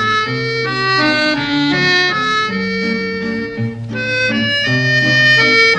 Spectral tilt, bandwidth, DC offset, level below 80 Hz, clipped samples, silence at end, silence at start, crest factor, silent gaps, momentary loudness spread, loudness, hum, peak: -4.5 dB/octave; 9.8 kHz; under 0.1%; -48 dBFS; under 0.1%; 0 s; 0 s; 14 dB; none; 12 LU; -14 LUFS; none; 0 dBFS